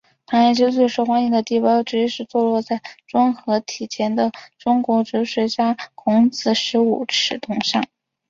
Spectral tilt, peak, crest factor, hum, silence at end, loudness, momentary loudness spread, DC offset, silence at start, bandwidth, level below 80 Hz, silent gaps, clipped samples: -4.5 dB/octave; -4 dBFS; 14 dB; none; 0.45 s; -19 LUFS; 7 LU; under 0.1%; 0.3 s; 7.6 kHz; -64 dBFS; none; under 0.1%